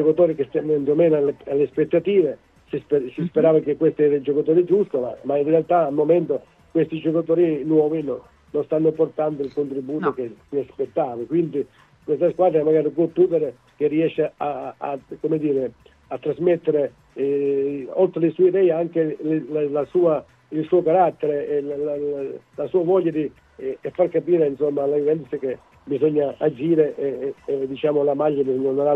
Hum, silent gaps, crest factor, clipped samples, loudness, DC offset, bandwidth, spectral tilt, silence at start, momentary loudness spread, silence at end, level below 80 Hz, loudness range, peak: none; none; 16 dB; under 0.1%; -21 LUFS; under 0.1%; 4.1 kHz; -10 dB/octave; 0 s; 11 LU; 0 s; -62 dBFS; 4 LU; -4 dBFS